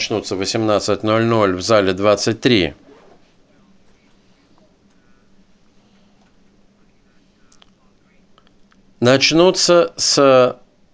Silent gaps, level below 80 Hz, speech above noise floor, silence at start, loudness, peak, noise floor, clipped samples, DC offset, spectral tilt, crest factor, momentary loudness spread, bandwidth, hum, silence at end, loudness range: none; -50 dBFS; 39 dB; 0 s; -15 LUFS; 0 dBFS; -54 dBFS; under 0.1%; under 0.1%; -4 dB/octave; 18 dB; 8 LU; 8 kHz; none; 0.4 s; 9 LU